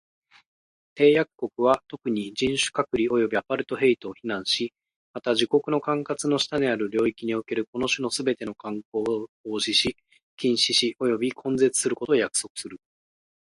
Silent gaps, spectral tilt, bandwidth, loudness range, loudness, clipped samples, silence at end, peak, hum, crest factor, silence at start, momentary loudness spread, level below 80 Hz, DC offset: 4.96-5.14 s, 7.67-7.73 s, 8.85-8.92 s, 9.29-9.44 s, 10.23-10.37 s, 12.50-12.55 s; -3.5 dB/octave; 11.5 kHz; 3 LU; -25 LUFS; under 0.1%; 0.65 s; -4 dBFS; none; 20 dB; 0.95 s; 10 LU; -62 dBFS; under 0.1%